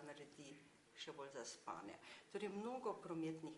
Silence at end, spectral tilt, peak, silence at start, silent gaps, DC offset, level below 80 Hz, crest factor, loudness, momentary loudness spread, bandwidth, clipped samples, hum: 0 s; -4.5 dB/octave; -34 dBFS; 0 s; none; under 0.1%; under -90 dBFS; 18 dB; -51 LUFS; 13 LU; 11.5 kHz; under 0.1%; none